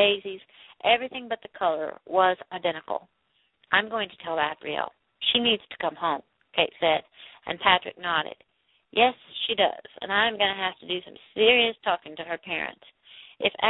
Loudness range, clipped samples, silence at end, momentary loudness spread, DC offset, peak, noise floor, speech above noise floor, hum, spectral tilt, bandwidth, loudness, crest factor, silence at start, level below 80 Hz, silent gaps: 3 LU; under 0.1%; 0 s; 13 LU; under 0.1%; -4 dBFS; -67 dBFS; 41 dB; none; -7.5 dB/octave; 4.1 kHz; -26 LUFS; 24 dB; 0 s; -66 dBFS; none